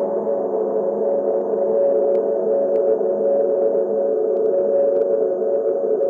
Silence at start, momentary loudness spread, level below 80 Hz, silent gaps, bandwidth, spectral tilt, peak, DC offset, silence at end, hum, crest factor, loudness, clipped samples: 0 s; 3 LU; -68 dBFS; none; 2.2 kHz; -10.5 dB/octave; -8 dBFS; under 0.1%; 0 s; none; 12 dB; -19 LUFS; under 0.1%